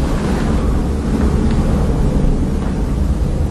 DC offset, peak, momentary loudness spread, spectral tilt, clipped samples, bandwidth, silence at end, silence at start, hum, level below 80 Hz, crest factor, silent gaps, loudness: under 0.1%; -2 dBFS; 3 LU; -7.5 dB/octave; under 0.1%; 12.5 kHz; 0 s; 0 s; none; -18 dBFS; 12 dB; none; -17 LUFS